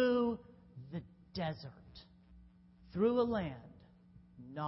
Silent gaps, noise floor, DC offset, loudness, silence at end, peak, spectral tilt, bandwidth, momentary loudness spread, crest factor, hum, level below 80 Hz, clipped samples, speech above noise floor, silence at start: none; -62 dBFS; under 0.1%; -37 LUFS; 0 s; -20 dBFS; -5.5 dB/octave; 5.8 kHz; 25 LU; 18 dB; none; -64 dBFS; under 0.1%; 26 dB; 0 s